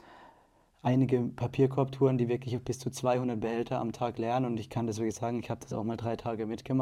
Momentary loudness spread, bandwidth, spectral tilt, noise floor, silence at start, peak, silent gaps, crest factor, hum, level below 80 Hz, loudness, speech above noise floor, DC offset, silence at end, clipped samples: 8 LU; 13.5 kHz; -7 dB/octave; -64 dBFS; 0.1 s; -14 dBFS; none; 16 dB; none; -62 dBFS; -31 LUFS; 34 dB; under 0.1%; 0 s; under 0.1%